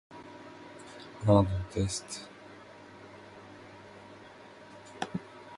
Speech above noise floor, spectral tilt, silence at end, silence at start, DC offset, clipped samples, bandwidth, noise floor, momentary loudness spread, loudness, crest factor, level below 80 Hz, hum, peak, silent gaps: 24 dB; -6 dB/octave; 0 s; 0.1 s; under 0.1%; under 0.1%; 11.5 kHz; -51 dBFS; 25 LU; -31 LUFS; 26 dB; -50 dBFS; none; -8 dBFS; none